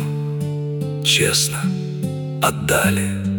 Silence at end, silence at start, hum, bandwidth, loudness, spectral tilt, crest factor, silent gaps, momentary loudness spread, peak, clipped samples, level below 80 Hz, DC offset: 0 s; 0 s; none; 18 kHz; -19 LUFS; -4 dB/octave; 18 dB; none; 10 LU; -2 dBFS; under 0.1%; -48 dBFS; under 0.1%